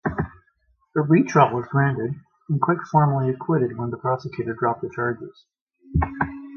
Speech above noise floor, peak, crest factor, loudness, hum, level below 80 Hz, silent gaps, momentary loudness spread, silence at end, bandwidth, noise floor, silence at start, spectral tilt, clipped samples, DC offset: 44 dB; -2 dBFS; 20 dB; -23 LUFS; none; -40 dBFS; 5.61-5.67 s; 12 LU; 0 s; 6.6 kHz; -65 dBFS; 0.05 s; -8.5 dB/octave; under 0.1%; under 0.1%